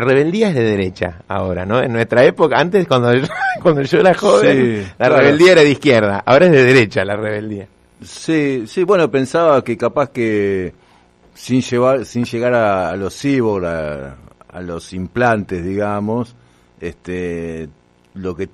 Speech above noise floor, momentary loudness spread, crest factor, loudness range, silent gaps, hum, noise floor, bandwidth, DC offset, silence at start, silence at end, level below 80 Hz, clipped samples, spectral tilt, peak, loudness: 36 dB; 17 LU; 14 dB; 10 LU; none; none; -50 dBFS; 12.5 kHz; under 0.1%; 0 s; 0.05 s; -50 dBFS; under 0.1%; -6 dB/octave; 0 dBFS; -14 LUFS